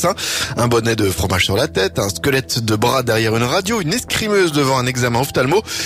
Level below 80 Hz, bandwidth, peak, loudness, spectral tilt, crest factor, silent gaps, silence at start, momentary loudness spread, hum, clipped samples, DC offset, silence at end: -40 dBFS; 16 kHz; -4 dBFS; -16 LUFS; -4 dB/octave; 12 dB; none; 0 s; 3 LU; none; under 0.1%; under 0.1%; 0 s